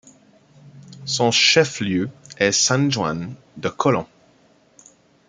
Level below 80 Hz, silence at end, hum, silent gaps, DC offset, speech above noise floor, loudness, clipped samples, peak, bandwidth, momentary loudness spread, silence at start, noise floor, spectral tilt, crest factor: -60 dBFS; 1.25 s; none; none; under 0.1%; 36 dB; -19 LUFS; under 0.1%; -2 dBFS; 10 kHz; 16 LU; 0.65 s; -56 dBFS; -3 dB/octave; 20 dB